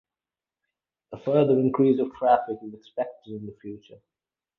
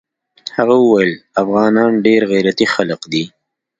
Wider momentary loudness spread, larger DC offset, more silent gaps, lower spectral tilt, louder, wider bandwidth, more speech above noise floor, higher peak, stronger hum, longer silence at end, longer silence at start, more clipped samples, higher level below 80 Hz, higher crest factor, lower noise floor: first, 20 LU vs 9 LU; neither; neither; first, -10 dB/octave vs -5.5 dB/octave; second, -24 LUFS vs -14 LUFS; second, 4.3 kHz vs 9 kHz; first, over 65 dB vs 22 dB; second, -6 dBFS vs 0 dBFS; neither; about the same, 0.65 s vs 0.55 s; first, 1.1 s vs 0.45 s; neither; second, -66 dBFS vs -58 dBFS; first, 20 dB vs 14 dB; first, under -90 dBFS vs -35 dBFS